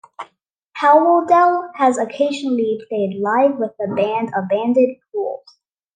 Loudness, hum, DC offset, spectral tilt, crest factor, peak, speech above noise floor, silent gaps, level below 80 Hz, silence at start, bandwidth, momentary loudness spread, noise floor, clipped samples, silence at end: -17 LUFS; none; under 0.1%; -5.5 dB/octave; 16 dB; -2 dBFS; 43 dB; 0.50-0.54 s; -74 dBFS; 0.2 s; 9.6 kHz; 14 LU; -60 dBFS; under 0.1%; 0.6 s